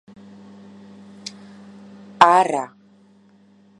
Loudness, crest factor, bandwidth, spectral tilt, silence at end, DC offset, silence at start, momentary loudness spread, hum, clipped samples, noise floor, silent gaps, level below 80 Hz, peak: -16 LUFS; 24 dB; 11 kHz; -3.5 dB/octave; 1.15 s; under 0.1%; 1.25 s; 23 LU; none; under 0.1%; -53 dBFS; none; -74 dBFS; 0 dBFS